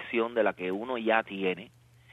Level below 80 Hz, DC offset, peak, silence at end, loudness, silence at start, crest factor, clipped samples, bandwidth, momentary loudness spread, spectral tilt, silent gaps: -70 dBFS; under 0.1%; -8 dBFS; 0.45 s; -30 LUFS; 0 s; 22 dB; under 0.1%; 9.4 kHz; 6 LU; -7 dB/octave; none